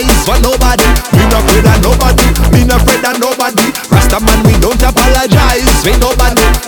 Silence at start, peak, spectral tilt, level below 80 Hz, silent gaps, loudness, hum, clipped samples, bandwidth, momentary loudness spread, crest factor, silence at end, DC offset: 0 s; 0 dBFS; -4.5 dB/octave; -12 dBFS; none; -9 LUFS; none; 0.3%; over 20 kHz; 3 LU; 8 dB; 0 s; under 0.1%